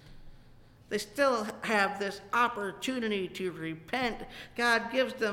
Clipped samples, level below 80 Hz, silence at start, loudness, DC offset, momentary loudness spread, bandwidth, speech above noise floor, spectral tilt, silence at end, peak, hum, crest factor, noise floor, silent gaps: under 0.1%; -58 dBFS; 0.05 s; -31 LUFS; under 0.1%; 9 LU; 17 kHz; 24 dB; -3.5 dB/octave; 0 s; -14 dBFS; none; 18 dB; -55 dBFS; none